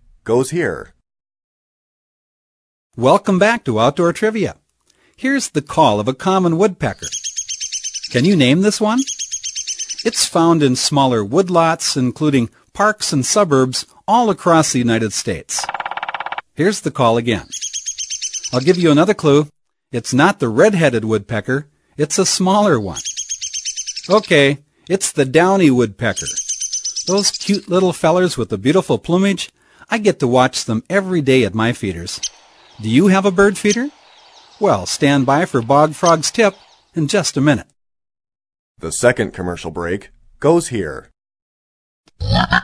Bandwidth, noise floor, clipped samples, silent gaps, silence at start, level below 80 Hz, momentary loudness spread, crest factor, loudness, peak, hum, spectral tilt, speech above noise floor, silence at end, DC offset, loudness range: 11 kHz; -58 dBFS; under 0.1%; 1.44-2.90 s, 38.59-38.75 s, 41.42-42.04 s; 0.25 s; -44 dBFS; 10 LU; 16 dB; -16 LUFS; 0 dBFS; none; -4.5 dB/octave; 43 dB; 0 s; under 0.1%; 4 LU